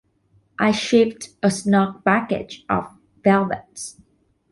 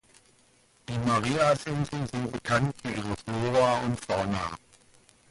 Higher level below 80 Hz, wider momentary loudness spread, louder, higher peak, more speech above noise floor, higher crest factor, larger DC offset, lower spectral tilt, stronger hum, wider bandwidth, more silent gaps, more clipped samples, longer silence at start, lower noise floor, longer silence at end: about the same, -56 dBFS vs -52 dBFS; first, 16 LU vs 10 LU; first, -20 LUFS vs -28 LUFS; first, -4 dBFS vs -14 dBFS; first, 41 dB vs 35 dB; about the same, 18 dB vs 16 dB; neither; about the same, -5.5 dB/octave vs -5.5 dB/octave; neither; about the same, 11.5 kHz vs 11.5 kHz; neither; neither; second, 0.6 s vs 0.9 s; about the same, -61 dBFS vs -63 dBFS; second, 0.6 s vs 0.75 s